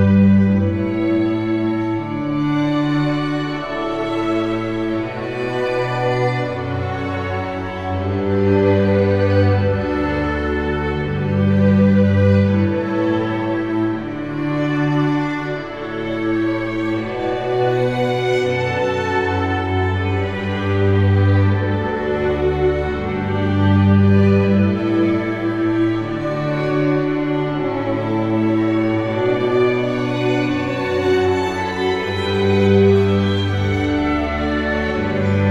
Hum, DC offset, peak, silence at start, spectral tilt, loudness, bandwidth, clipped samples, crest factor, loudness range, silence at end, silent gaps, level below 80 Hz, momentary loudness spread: none; under 0.1%; -4 dBFS; 0 s; -8 dB/octave; -18 LUFS; 7.8 kHz; under 0.1%; 14 dB; 4 LU; 0 s; none; -38 dBFS; 8 LU